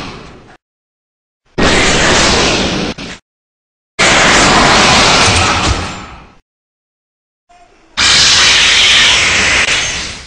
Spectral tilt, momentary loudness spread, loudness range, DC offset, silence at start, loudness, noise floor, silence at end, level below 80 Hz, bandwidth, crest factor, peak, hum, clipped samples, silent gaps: -2 dB/octave; 17 LU; 5 LU; under 0.1%; 0 s; -7 LUFS; -36 dBFS; 0 s; -28 dBFS; 16 kHz; 12 dB; 0 dBFS; none; under 0.1%; 0.62-1.40 s, 3.22-3.98 s, 6.42-7.47 s